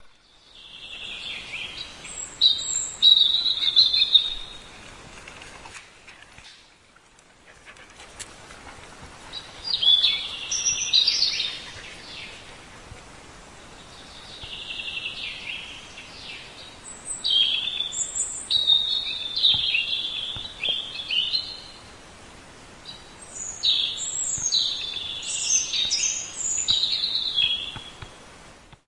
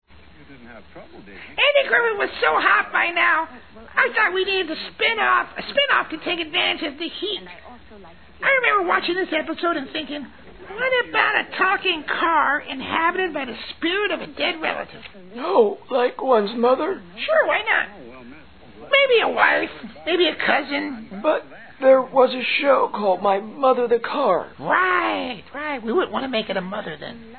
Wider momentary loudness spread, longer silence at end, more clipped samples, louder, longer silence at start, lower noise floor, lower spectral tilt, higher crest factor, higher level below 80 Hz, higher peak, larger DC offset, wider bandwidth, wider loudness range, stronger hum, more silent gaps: first, 25 LU vs 13 LU; first, 0.15 s vs 0 s; neither; about the same, -21 LUFS vs -20 LUFS; second, 0 s vs 0.4 s; first, -55 dBFS vs -47 dBFS; second, 1.5 dB/octave vs -7 dB/octave; about the same, 24 dB vs 20 dB; about the same, -54 dBFS vs -58 dBFS; about the same, -4 dBFS vs -2 dBFS; second, under 0.1% vs 0.4%; first, 11.5 kHz vs 4.5 kHz; first, 16 LU vs 3 LU; neither; neither